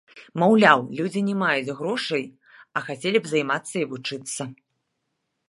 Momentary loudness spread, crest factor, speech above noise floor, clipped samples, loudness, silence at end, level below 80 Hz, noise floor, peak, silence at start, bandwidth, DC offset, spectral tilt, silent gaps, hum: 15 LU; 24 dB; 54 dB; under 0.1%; -23 LUFS; 0.95 s; -74 dBFS; -77 dBFS; 0 dBFS; 0.15 s; 11.5 kHz; under 0.1%; -4.5 dB/octave; none; none